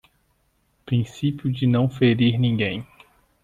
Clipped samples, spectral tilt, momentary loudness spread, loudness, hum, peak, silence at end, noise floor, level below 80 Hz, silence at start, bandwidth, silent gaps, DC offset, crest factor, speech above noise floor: under 0.1%; -8 dB/octave; 7 LU; -22 LUFS; none; -6 dBFS; 0.6 s; -66 dBFS; -56 dBFS; 0.85 s; 7.6 kHz; none; under 0.1%; 16 dB; 46 dB